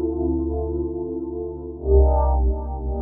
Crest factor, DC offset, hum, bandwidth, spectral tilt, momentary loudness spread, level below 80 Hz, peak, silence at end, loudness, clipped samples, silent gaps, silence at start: 16 dB; under 0.1%; none; 1.3 kHz; -12.5 dB/octave; 12 LU; -24 dBFS; -6 dBFS; 0 s; -23 LUFS; under 0.1%; none; 0 s